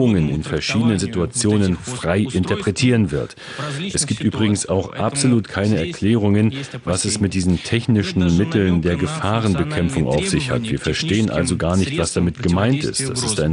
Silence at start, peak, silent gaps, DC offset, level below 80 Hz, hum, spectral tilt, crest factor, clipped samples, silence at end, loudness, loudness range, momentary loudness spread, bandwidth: 0 s; -4 dBFS; none; under 0.1%; -38 dBFS; none; -5 dB/octave; 14 dB; under 0.1%; 0 s; -19 LUFS; 1 LU; 5 LU; 11 kHz